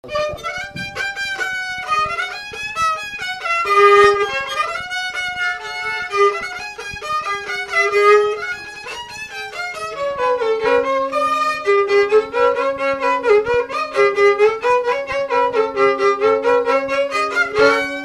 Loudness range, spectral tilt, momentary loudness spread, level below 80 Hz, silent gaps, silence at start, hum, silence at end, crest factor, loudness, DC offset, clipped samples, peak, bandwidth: 5 LU; -3 dB/octave; 12 LU; -52 dBFS; none; 0.05 s; none; 0 s; 18 dB; -17 LUFS; under 0.1%; under 0.1%; 0 dBFS; 13 kHz